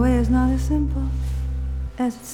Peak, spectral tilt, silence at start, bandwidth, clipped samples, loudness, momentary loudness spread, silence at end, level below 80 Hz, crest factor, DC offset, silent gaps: -8 dBFS; -7.5 dB/octave; 0 s; 14 kHz; under 0.1%; -23 LUFS; 9 LU; 0 s; -24 dBFS; 12 dB; under 0.1%; none